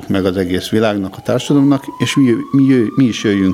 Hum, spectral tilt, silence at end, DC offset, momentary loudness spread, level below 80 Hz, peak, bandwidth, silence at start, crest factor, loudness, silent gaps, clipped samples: none; -6 dB/octave; 0 s; under 0.1%; 6 LU; -52 dBFS; 0 dBFS; 14.5 kHz; 0 s; 14 dB; -14 LUFS; none; under 0.1%